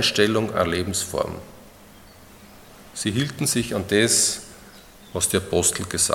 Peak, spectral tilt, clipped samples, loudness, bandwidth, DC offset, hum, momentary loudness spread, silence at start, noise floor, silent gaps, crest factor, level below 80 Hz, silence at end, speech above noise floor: -2 dBFS; -3 dB/octave; under 0.1%; -22 LUFS; 17.5 kHz; under 0.1%; none; 14 LU; 0 s; -47 dBFS; none; 22 dB; -52 dBFS; 0 s; 25 dB